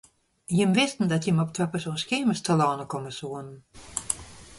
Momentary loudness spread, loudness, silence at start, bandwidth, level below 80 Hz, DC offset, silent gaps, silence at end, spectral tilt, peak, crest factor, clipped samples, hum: 13 LU; -26 LUFS; 0.5 s; 11.5 kHz; -58 dBFS; under 0.1%; none; 0 s; -5 dB/octave; -6 dBFS; 22 dB; under 0.1%; none